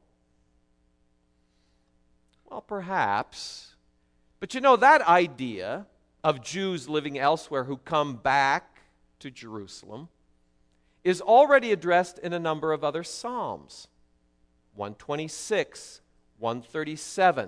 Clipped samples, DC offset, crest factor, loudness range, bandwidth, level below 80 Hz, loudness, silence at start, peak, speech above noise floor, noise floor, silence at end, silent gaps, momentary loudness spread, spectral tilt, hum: under 0.1%; under 0.1%; 22 dB; 10 LU; 11 kHz; -66 dBFS; -25 LUFS; 2.5 s; -6 dBFS; 42 dB; -68 dBFS; 0 s; none; 23 LU; -4.5 dB/octave; none